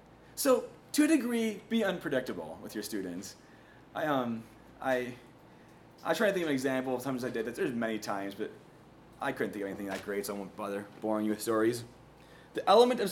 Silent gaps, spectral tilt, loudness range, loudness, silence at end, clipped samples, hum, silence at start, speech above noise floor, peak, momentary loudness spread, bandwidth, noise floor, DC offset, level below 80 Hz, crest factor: none; -4.5 dB/octave; 5 LU; -32 LUFS; 0 s; under 0.1%; none; 0.3 s; 24 dB; -10 dBFS; 14 LU; 18 kHz; -56 dBFS; under 0.1%; -68 dBFS; 22 dB